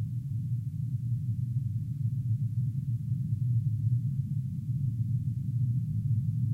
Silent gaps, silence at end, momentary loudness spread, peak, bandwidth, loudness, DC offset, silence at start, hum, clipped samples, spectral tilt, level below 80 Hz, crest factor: none; 0 s; 4 LU; -18 dBFS; 0.4 kHz; -32 LUFS; under 0.1%; 0 s; none; under 0.1%; -10.5 dB/octave; -54 dBFS; 12 dB